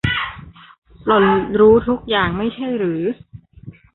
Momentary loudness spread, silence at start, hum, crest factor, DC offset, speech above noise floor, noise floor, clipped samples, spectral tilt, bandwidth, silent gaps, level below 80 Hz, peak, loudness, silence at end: 15 LU; 0.05 s; none; 16 dB; under 0.1%; 24 dB; -40 dBFS; under 0.1%; -8.5 dB/octave; 4.1 kHz; 0.78-0.82 s; -40 dBFS; -2 dBFS; -17 LUFS; 0.25 s